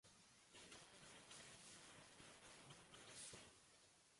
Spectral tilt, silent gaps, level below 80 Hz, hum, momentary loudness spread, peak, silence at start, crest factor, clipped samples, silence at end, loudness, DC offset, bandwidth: -1.5 dB/octave; none; -86 dBFS; none; 10 LU; -44 dBFS; 0.05 s; 20 dB; under 0.1%; 0 s; -62 LUFS; under 0.1%; 11.5 kHz